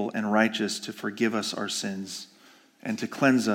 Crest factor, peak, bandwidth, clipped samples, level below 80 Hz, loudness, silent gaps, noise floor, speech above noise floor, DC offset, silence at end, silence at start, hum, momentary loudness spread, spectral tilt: 20 dB; -8 dBFS; 17 kHz; under 0.1%; -82 dBFS; -27 LUFS; none; -56 dBFS; 30 dB; under 0.1%; 0 s; 0 s; none; 14 LU; -4 dB/octave